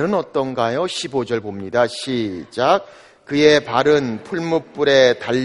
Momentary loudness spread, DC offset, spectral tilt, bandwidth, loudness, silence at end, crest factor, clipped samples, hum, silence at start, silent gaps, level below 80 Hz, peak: 10 LU; under 0.1%; -5 dB/octave; 11.5 kHz; -18 LUFS; 0 s; 18 dB; under 0.1%; none; 0 s; none; -54 dBFS; 0 dBFS